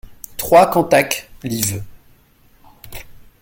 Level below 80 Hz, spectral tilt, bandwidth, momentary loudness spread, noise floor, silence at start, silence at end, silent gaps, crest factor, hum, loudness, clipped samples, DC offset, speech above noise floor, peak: -44 dBFS; -4 dB/octave; 17 kHz; 24 LU; -52 dBFS; 0.1 s; 0.3 s; none; 18 dB; none; -16 LUFS; under 0.1%; under 0.1%; 38 dB; 0 dBFS